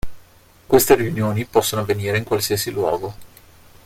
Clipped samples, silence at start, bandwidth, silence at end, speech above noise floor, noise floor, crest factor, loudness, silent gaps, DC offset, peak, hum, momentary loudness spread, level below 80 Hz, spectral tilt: under 0.1%; 0.05 s; 16.5 kHz; 0.1 s; 31 dB; -49 dBFS; 20 dB; -19 LUFS; none; under 0.1%; 0 dBFS; none; 9 LU; -44 dBFS; -4.5 dB/octave